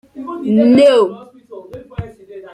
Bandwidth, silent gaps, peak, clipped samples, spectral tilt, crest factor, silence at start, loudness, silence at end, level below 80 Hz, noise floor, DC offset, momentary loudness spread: 10.5 kHz; none; -2 dBFS; under 0.1%; -6.5 dB/octave; 14 dB; 0.15 s; -12 LUFS; 0.05 s; -48 dBFS; -35 dBFS; under 0.1%; 24 LU